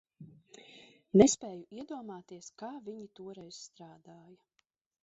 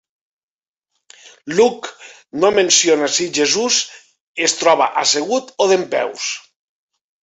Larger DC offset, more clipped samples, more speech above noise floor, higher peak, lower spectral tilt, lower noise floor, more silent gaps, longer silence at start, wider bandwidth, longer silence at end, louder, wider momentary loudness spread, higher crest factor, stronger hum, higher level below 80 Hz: neither; neither; second, 46 dB vs over 74 dB; second, -8 dBFS vs -2 dBFS; first, -6.5 dB/octave vs -1.5 dB/octave; second, -79 dBFS vs under -90 dBFS; second, none vs 4.21-4.35 s; second, 0.2 s vs 1.25 s; about the same, 8 kHz vs 8.4 kHz; about the same, 0.9 s vs 0.85 s; second, -29 LUFS vs -16 LUFS; first, 29 LU vs 17 LU; first, 26 dB vs 18 dB; neither; about the same, -66 dBFS vs -64 dBFS